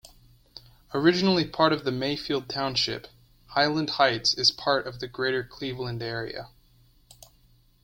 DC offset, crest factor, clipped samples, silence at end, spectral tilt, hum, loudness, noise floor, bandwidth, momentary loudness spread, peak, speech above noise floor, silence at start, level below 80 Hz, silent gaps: under 0.1%; 22 dB; under 0.1%; 1.4 s; -4.5 dB/octave; none; -25 LUFS; -60 dBFS; 16.5 kHz; 12 LU; -6 dBFS; 34 dB; 0.05 s; -56 dBFS; none